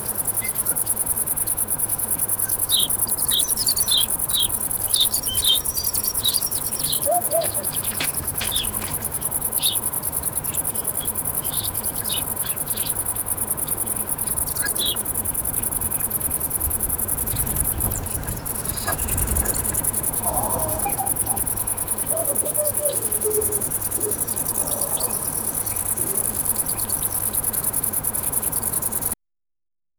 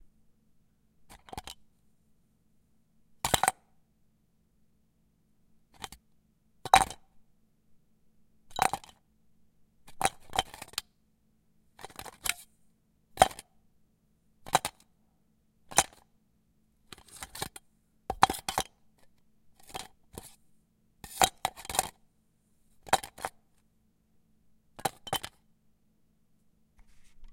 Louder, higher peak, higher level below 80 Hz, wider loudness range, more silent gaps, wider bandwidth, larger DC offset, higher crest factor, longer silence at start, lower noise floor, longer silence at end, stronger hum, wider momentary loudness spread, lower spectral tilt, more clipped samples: first, -20 LUFS vs -31 LUFS; about the same, -2 dBFS vs -2 dBFS; first, -40 dBFS vs -58 dBFS; second, 4 LU vs 7 LU; neither; first, over 20 kHz vs 16.5 kHz; neither; second, 22 dB vs 34 dB; second, 0 s vs 1.1 s; first, under -90 dBFS vs -71 dBFS; first, 0.85 s vs 0 s; neither; second, 5 LU vs 22 LU; about the same, -1.5 dB/octave vs -1.5 dB/octave; neither